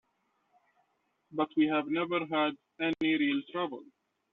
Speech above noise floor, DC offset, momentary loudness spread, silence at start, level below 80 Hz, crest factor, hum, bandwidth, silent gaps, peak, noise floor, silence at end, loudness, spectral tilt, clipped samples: 46 dB; under 0.1%; 8 LU; 1.3 s; -76 dBFS; 18 dB; none; 4.2 kHz; none; -16 dBFS; -76 dBFS; 0.5 s; -31 LUFS; -3 dB/octave; under 0.1%